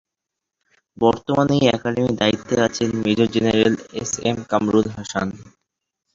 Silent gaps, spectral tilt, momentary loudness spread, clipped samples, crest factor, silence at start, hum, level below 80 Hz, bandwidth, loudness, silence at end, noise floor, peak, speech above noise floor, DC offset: none; -5 dB/octave; 8 LU; under 0.1%; 20 dB; 1 s; none; -50 dBFS; 7.8 kHz; -20 LUFS; 0.65 s; -83 dBFS; -2 dBFS; 64 dB; under 0.1%